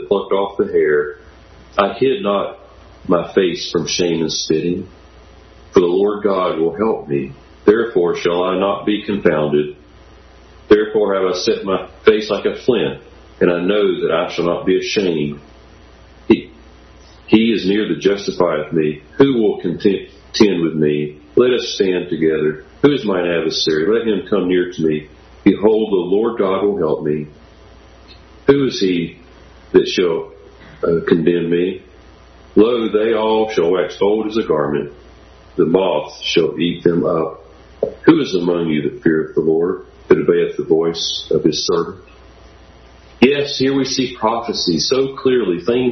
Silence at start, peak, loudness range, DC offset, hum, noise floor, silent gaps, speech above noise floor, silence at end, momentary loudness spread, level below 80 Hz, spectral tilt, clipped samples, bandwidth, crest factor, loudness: 0 s; 0 dBFS; 2 LU; under 0.1%; none; -43 dBFS; none; 27 dB; 0 s; 8 LU; -48 dBFS; -5.5 dB/octave; under 0.1%; 6.4 kHz; 16 dB; -17 LUFS